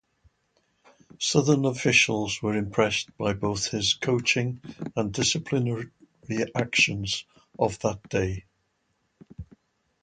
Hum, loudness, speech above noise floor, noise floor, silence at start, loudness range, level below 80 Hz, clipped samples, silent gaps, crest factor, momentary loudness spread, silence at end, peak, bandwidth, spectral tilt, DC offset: none; -25 LUFS; 47 dB; -73 dBFS; 1.2 s; 4 LU; -52 dBFS; under 0.1%; none; 22 dB; 12 LU; 0.6 s; -6 dBFS; 9.4 kHz; -4 dB/octave; under 0.1%